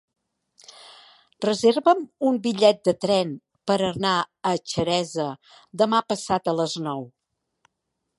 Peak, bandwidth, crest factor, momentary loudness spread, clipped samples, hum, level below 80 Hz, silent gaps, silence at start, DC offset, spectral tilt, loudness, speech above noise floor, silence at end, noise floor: -4 dBFS; 11.5 kHz; 22 dB; 12 LU; under 0.1%; none; -62 dBFS; none; 0.85 s; under 0.1%; -5 dB/octave; -23 LUFS; 57 dB; 1.1 s; -79 dBFS